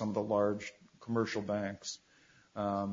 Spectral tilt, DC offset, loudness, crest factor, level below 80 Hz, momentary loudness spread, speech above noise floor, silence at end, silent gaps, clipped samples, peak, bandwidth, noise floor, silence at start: -5.5 dB/octave; under 0.1%; -35 LUFS; 18 dB; -72 dBFS; 16 LU; 30 dB; 0 s; none; under 0.1%; -18 dBFS; 7.4 kHz; -65 dBFS; 0 s